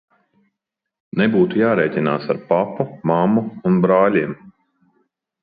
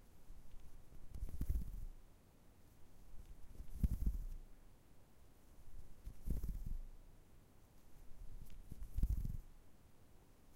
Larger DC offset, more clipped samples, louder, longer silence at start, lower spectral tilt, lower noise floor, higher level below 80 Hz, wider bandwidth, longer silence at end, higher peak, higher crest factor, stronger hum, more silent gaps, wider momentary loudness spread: neither; neither; first, -18 LUFS vs -49 LUFS; first, 1.15 s vs 0 s; first, -11.5 dB/octave vs -7.5 dB/octave; first, -82 dBFS vs -64 dBFS; second, -60 dBFS vs -48 dBFS; second, 5 kHz vs 16 kHz; first, 0.95 s vs 0 s; first, -2 dBFS vs -22 dBFS; second, 16 dB vs 24 dB; neither; neither; second, 8 LU vs 25 LU